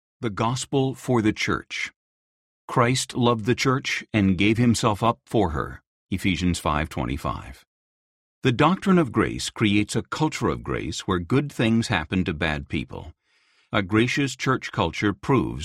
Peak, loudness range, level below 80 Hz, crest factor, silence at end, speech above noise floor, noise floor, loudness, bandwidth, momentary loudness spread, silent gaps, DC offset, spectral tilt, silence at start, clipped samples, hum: -4 dBFS; 3 LU; -44 dBFS; 20 dB; 0 s; 41 dB; -64 dBFS; -24 LUFS; 15 kHz; 9 LU; 1.96-2.68 s, 5.87-6.07 s, 7.67-8.42 s; under 0.1%; -5.5 dB/octave; 0.2 s; under 0.1%; none